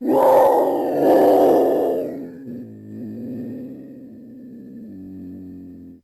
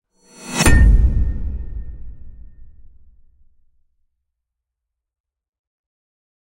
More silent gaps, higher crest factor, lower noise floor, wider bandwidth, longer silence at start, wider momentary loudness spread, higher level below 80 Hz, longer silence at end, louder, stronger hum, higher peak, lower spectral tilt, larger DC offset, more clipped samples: neither; about the same, 14 dB vs 18 dB; second, -39 dBFS vs -82 dBFS; about the same, 16 kHz vs 16 kHz; second, 0 s vs 0.4 s; about the same, 25 LU vs 24 LU; second, -60 dBFS vs -22 dBFS; second, 0.1 s vs 3.9 s; about the same, -16 LUFS vs -17 LUFS; neither; second, -6 dBFS vs -2 dBFS; first, -7 dB/octave vs -4.5 dB/octave; neither; neither